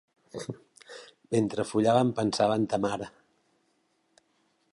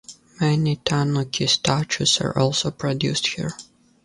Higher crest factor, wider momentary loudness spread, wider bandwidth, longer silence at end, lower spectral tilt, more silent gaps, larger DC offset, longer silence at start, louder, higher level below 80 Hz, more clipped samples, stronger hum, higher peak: about the same, 20 dB vs 20 dB; first, 23 LU vs 6 LU; about the same, 11.5 kHz vs 11.5 kHz; first, 1.65 s vs 0.4 s; first, -6 dB/octave vs -4 dB/octave; neither; neither; first, 0.35 s vs 0.1 s; second, -27 LUFS vs -21 LUFS; second, -66 dBFS vs -52 dBFS; neither; neither; second, -10 dBFS vs -2 dBFS